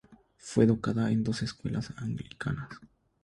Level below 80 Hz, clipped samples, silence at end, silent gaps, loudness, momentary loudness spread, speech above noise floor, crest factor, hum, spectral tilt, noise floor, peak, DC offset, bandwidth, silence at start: -56 dBFS; under 0.1%; 0.4 s; none; -30 LUFS; 16 LU; 21 dB; 20 dB; none; -7 dB/octave; -51 dBFS; -10 dBFS; under 0.1%; 11 kHz; 0.1 s